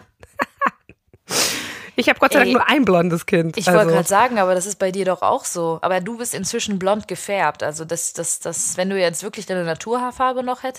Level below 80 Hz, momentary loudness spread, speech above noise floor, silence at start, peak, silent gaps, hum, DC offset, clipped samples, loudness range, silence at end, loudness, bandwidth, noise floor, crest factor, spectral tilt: -58 dBFS; 10 LU; 33 dB; 0.4 s; -2 dBFS; none; none; under 0.1%; under 0.1%; 6 LU; 0 s; -19 LUFS; 15.5 kHz; -52 dBFS; 18 dB; -3.5 dB/octave